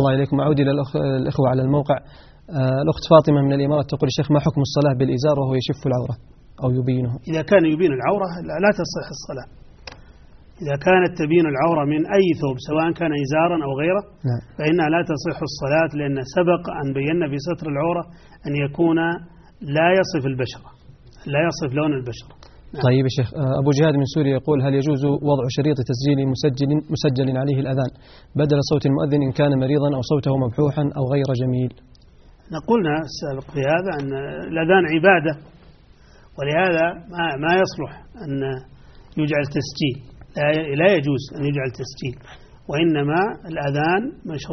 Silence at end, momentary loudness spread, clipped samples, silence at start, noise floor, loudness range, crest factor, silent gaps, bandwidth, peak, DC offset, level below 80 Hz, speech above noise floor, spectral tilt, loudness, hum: 0 s; 12 LU; under 0.1%; 0 s; -48 dBFS; 4 LU; 20 dB; none; 6.4 kHz; 0 dBFS; under 0.1%; -48 dBFS; 29 dB; -6 dB/octave; -20 LUFS; none